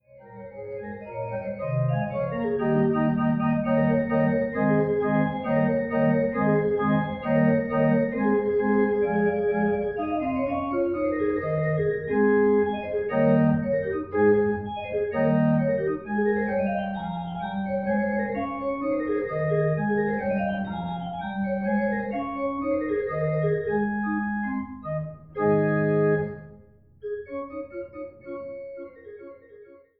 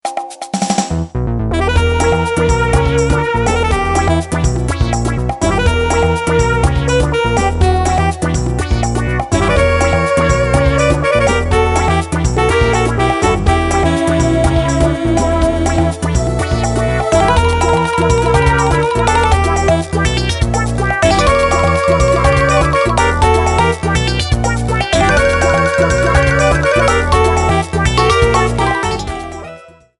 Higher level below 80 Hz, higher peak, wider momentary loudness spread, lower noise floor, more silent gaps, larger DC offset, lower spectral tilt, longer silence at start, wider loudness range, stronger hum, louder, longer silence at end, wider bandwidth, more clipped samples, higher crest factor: second, -54 dBFS vs -20 dBFS; second, -10 dBFS vs 0 dBFS; first, 14 LU vs 5 LU; first, -53 dBFS vs -36 dBFS; neither; first, 0.1% vs under 0.1%; first, -12 dB/octave vs -5.5 dB/octave; about the same, 0.15 s vs 0.05 s; about the same, 4 LU vs 2 LU; neither; second, -25 LUFS vs -13 LUFS; about the same, 0.25 s vs 0.35 s; second, 4.7 kHz vs 11.5 kHz; neither; about the same, 14 dB vs 12 dB